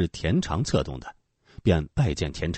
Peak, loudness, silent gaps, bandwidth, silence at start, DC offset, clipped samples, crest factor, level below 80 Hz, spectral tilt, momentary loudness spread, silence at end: -10 dBFS; -26 LUFS; none; 8.8 kHz; 0 s; under 0.1%; under 0.1%; 16 dB; -38 dBFS; -6 dB/octave; 11 LU; 0 s